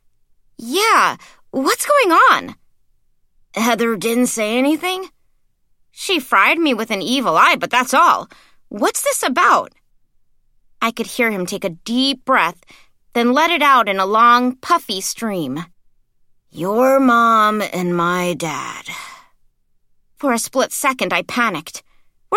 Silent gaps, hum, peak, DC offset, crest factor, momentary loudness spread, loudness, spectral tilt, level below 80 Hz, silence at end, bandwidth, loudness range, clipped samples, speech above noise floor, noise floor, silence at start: none; none; 0 dBFS; under 0.1%; 18 dB; 15 LU; -16 LUFS; -3 dB/octave; -60 dBFS; 0 s; 16.5 kHz; 6 LU; under 0.1%; 42 dB; -58 dBFS; 0.6 s